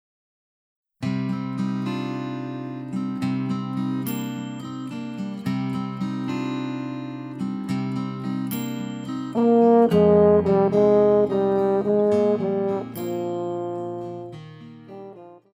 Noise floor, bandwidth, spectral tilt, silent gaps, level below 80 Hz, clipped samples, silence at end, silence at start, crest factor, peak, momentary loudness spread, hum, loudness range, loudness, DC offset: -43 dBFS; over 20 kHz; -8 dB/octave; none; -58 dBFS; under 0.1%; 0.2 s; 1 s; 18 dB; -6 dBFS; 16 LU; none; 10 LU; -23 LUFS; under 0.1%